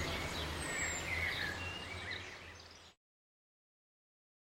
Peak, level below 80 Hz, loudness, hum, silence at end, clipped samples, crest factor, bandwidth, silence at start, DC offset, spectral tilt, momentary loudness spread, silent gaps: -26 dBFS; -56 dBFS; -39 LUFS; none; 1.5 s; under 0.1%; 18 dB; 16 kHz; 0 s; under 0.1%; -2.5 dB/octave; 16 LU; none